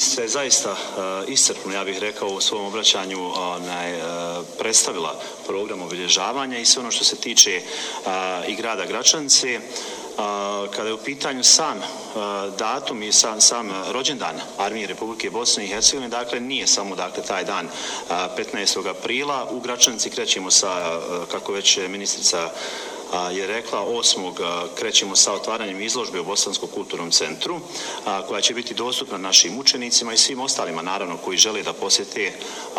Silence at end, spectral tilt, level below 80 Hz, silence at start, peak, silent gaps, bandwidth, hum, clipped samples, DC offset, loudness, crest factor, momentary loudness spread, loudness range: 0 s; 0 dB/octave; -64 dBFS; 0 s; 0 dBFS; none; 16 kHz; none; under 0.1%; under 0.1%; -20 LUFS; 22 dB; 12 LU; 4 LU